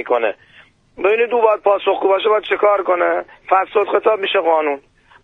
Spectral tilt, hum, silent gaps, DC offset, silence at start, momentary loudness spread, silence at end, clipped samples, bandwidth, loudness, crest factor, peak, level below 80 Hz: -5 dB/octave; none; none; under 0.1%; 0 s; 7 LU; 0.45 s; under 0.1%; 4.1 kHz; -16 LUFS; 16 dB; 0 dBFS; -60 dBFS